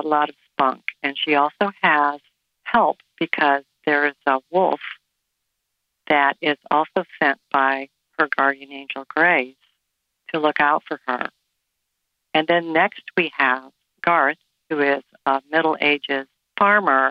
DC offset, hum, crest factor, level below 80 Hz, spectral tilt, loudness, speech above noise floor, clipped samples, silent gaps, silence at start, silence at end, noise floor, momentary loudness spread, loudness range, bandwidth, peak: under 0.1%; none; 16 dB; -68 dBFS; -6.5 dB/octave; -20 LUFS; 57 dB; under 0.1%; none; 0 s; 0 s; -77 dBFS; 10 LU; 2 LU; 5.6 kHz; -4 dBFS